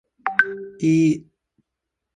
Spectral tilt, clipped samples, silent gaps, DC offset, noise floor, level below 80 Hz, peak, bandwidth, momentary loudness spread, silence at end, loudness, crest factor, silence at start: -6.5 dB/octave; under 0.1%; none; under 0.1%; -82 dBFS; -64 dBFS; -2 dBFS; 9.8 kHz; 7 LU; 0.95 s; -21 LUFS; 22 dB; 0.25 s